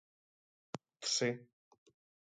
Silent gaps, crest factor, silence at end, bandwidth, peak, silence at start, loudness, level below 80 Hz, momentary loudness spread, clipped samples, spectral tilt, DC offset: none; 22 dB; 0.8 s; 10.5 kHz; -22 dBFS; 0.75 s; -36 LUFS; -88 dBFS; 17 LU; under 0.1%; -2.5 dB/octave; under 0.1%